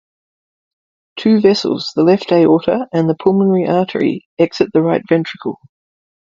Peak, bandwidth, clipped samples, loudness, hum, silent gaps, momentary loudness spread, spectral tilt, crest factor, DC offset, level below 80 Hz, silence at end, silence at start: 0 dBFS; 7.6 kHz; under 0.1%; -14 LUFS; none; 4.26-4.37 s; 9 LU; -7 dB/octave; 14 dB; under 0.1%; -56 dBFS; 0.85 s; 1.15 s